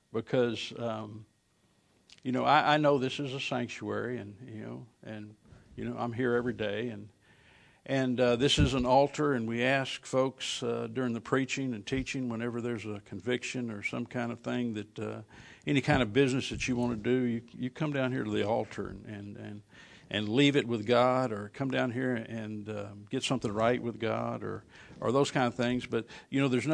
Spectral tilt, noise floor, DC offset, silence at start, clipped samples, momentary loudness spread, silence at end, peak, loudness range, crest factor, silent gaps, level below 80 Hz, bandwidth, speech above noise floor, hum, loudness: -5.5 dB/octave; -70 dBFS; under 0.1%; 0.15 s; under 0.1%; 16 LU; 0 s; -8 dBFS; 7 LU; 22 dB; none; -54 dBFS; 10.5 kHz; 39 dB; none; -31 LUFS